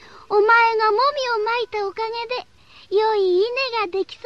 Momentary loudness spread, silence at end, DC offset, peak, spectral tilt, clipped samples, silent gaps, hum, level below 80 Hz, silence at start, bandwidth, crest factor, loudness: 11 LU; 0.1 s; 0.2%; -6 dBFS; -3 dB/octave; under 0.1%; none; none; -62 dBFS; 0.15 s; 7.4 kHz; 14 dB; -20 LUFS